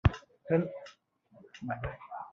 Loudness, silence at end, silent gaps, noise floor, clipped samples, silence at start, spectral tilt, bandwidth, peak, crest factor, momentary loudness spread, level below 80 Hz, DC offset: -35 LUFS; 0.05 s; none; -60 dBFS; under 0.1%; 0.05 s; -8.5 dB/octave; 7.2 kHz; -12 dBFS; 24 dB; 19 LU; -42 dBFS; under 0.1%